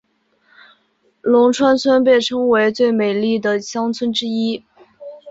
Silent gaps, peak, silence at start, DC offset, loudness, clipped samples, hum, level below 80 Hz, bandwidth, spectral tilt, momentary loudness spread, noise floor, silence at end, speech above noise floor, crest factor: none; -2 dBFS; 1.25 s; under 0.1%; -16 LUFS; under 0.1%; none; -60 dBFS; 8 kHz; -4.5 dB/octave; 10 LU; -61 dBFS; 0 s; 46 dB; 14 dB